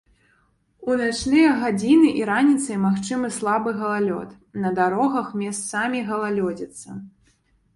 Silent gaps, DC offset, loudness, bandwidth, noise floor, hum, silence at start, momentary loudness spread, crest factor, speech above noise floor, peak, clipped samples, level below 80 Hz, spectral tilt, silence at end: none; under 0.1%; -21 LUFS; 11.5 kHz; -63 dBFS; none; 0.8 s; 15 LU; 16 dB; 42 dB; -6 dBFS; under 0.1%; -56 dBFS; -5 dB/octave; 0.65 s